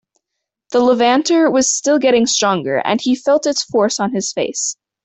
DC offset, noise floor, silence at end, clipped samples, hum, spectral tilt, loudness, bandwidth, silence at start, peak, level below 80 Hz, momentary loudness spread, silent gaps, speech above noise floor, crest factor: under 0.1%; -79 dBFS; 0.3 s; under 0.1%; none; -3 dB/octave; -15 LUFS; 8.4 kHz; 0.7 s; -2 dBFS; -60 dBFS; 7 LU; none; 64 dB; 14 dB